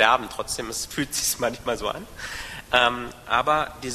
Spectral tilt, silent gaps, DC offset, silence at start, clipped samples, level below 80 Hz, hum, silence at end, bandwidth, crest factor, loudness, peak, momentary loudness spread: -2 dB/octave; none; under 0.1%; 0 s; under 0.1%; -48 dBFS; none; 0 s; 13.5 kHz; 22 dB; -25 LUFS; -2 dBFS; 13 LU